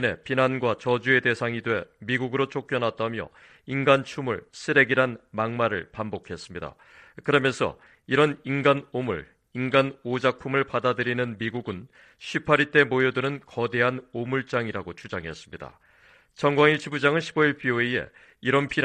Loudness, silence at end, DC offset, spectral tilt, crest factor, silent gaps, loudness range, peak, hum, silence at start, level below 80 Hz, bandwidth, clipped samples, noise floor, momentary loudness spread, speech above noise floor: -25 LUFS; 0 s; under 0.1%; -6 dB/octave; 22 dB; none; 2 LU; -4 dBFS; none; 0 s; -60 dBFS; 9.6 kHz; under 0.1%; -57 dBFS; 15 LU; 32 dB